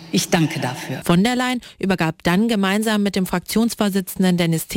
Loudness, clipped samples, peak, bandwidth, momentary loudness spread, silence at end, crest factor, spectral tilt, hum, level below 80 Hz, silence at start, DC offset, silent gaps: -19 LUFS; under 0.1%; -6 dBFS; 17 kHz; 6 LU; 0 s; 14 dB; -5 dB/octave; none; -48 dBFS; 0 s; under 0.1%; none